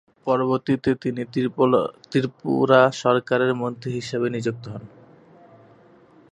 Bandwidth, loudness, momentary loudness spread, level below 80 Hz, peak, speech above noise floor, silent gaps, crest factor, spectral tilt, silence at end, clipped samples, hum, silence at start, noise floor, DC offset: 10.5 kHz; -22 LUFS; 11 LU; -62 dBFS; -2 dBFS; 31 dB; none; 20 dB; -6.5 dB/octave; 1.45 s; under 0.1%; none; 0.25 s; -52 dBFS; under 0.1%